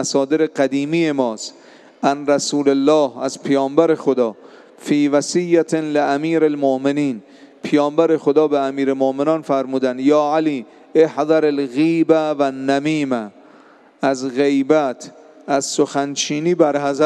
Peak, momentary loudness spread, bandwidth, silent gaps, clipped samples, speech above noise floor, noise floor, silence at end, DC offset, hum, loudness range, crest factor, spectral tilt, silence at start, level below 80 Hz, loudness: 0 dBFS; 7 LU; 11.5 kHz; none; under 0.1%; 30 dB; -47 dBFS; 0 s; under 0.1%; none; 2 LU; 16 dB; -5 dB/octave; 0 s; -76 dBFS; -18 LUFS